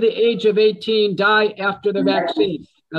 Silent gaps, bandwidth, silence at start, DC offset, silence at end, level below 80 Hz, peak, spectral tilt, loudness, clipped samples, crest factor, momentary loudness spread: none; 7.2 kHz; 0 s; under 0.1%; 0 s; -64 dBFS; -4 dBFS; -6.5 dB/octave; -18 LUFS; under 0.1%; 14 dB; 6 LU